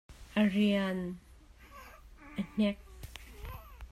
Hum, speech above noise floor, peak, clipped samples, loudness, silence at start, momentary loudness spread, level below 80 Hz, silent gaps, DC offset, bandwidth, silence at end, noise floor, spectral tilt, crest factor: none; 26 dB; -16 dBFS; under 0.1%; -32 LUFS; 0.1 s; 24 LU; -54 dBFS; none; under 0.1%; 13.5 kHz; 0.05 s; -56 dBFS; -6.5 dB/octave; 18 dB